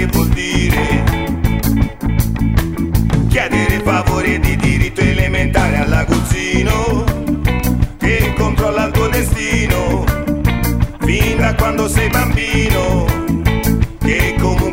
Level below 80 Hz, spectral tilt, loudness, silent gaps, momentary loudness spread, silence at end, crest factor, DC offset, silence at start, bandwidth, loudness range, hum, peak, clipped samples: -20 dBFS; -5.5 dB/octave; -15 LUFS; none; 3 LU; 0 s; 14 dB; under 0.1%; 0 s; 16.5 kHz; 1 LU; none; 0 dBFS; under 0.1%